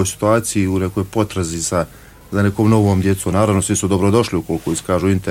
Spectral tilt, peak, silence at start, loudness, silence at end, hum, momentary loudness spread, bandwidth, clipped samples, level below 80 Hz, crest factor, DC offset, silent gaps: -5.5 dB/octave; -2 dBFS; 0 s; -17 LUFS; 0 s; none; 7 LU; 16.5 kHz; under 0.1%; -42 dBFS; 14 dB; under 0.1%; none